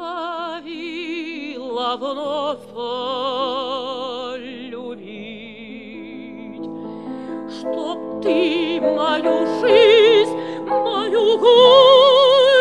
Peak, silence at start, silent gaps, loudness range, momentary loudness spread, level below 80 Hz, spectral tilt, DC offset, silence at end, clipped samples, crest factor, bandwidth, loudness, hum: 0 dBFS; 0 s; none; 18 LU; 23 LU; -64 dBFS; -4 dB/octave; 0.2%; 0 s; under 0.1%; 18 dB; 10 kHz; -16 LUFS; none